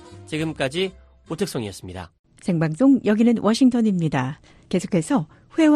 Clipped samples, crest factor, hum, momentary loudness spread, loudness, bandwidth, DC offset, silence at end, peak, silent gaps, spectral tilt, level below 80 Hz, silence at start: under 0.1%; 16 dB; none; 17 LU; -22 LUFS; 13 kHz; under 0.1%; 0 s; -6 dBFS; 2.19-2.24 s; -6.5 dB/octave; -54 dBFS; 0.05 s